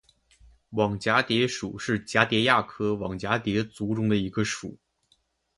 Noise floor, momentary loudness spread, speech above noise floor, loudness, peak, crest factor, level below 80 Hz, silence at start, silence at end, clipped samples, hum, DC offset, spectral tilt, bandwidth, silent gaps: -69 dBFS; 9 LU; 43 dB; -26 LUFS; -4 dBFS; 24 dB; -56 dBFS; 0.7 s; 0.85 s; under 0.1%; none; under 0.1%; -5 dB/octave; 11.5 kHz; none